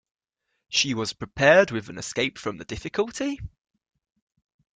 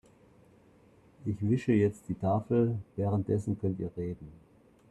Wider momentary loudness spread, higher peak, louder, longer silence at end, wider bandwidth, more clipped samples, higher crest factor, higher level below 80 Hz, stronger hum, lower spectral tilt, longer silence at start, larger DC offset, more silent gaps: first, 16 LU vs 12 LU; first, -2 dBFS vs -14 dBFS; first, -24 LUFS vs -31 LUFS; first, 1.3 s vs 0.55 s; second, 9.4 kHz vs 11 kHz; neither; first, 24 dB vs 18 dB; first, -52 dBFS vs -62 dBFS; neither; second, -3.5 dB/octave vs -9.5 dB/octave; second, 0.7 s vs 1.2 s; neither; neither